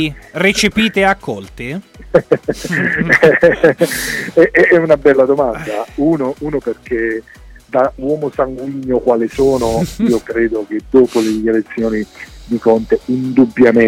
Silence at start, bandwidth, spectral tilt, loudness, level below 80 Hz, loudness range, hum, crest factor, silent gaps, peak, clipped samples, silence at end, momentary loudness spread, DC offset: 0 s; 17 kHz; -5.5 dB/octave; -14 LUFS; -38 dBFS; 6 LU; none; 14 dB; none; 0 dBFS; under 0.1%; 0 s; 12 LU; under 0.1%